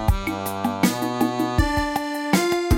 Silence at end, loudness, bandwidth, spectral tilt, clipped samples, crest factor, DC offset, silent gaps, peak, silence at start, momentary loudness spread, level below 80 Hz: 0 s; -23 LUFS; 17 kHz; -5 dB/octave; under 0.1%; 18 dB; under 0.1%; none; -4 dBFS; 0 s; 5 LU; -30 dBFS